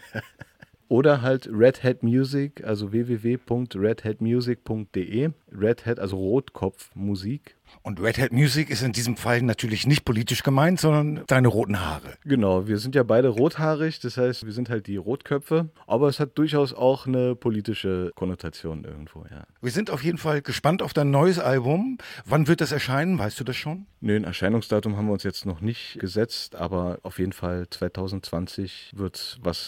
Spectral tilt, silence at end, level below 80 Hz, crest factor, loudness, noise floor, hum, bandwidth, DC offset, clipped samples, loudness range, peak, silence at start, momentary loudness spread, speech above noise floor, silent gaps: -6.5 dB/octave; 0 s; -54 dBFS; 20 dB; -24 LUFS; -49 dBFS; none; 17 kHz; under 0.1%; under 0.1%; 6 LU; -4 dBFS; 0.05 s; 11 LU; 25 dB; none